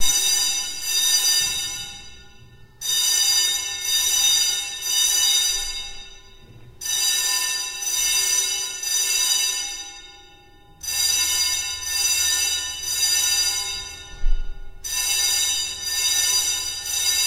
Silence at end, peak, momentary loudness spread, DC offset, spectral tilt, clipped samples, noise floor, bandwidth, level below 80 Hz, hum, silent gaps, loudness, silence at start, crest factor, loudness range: 0 s; -6 dBFS; 15 LU; under 0.1%; 2.5 dB/octave; under 0.1%; -49 dBFS; 16 kHz; -36 dBFS; none; none; -19 LUFS; 0 s; 18 dB; 3 LU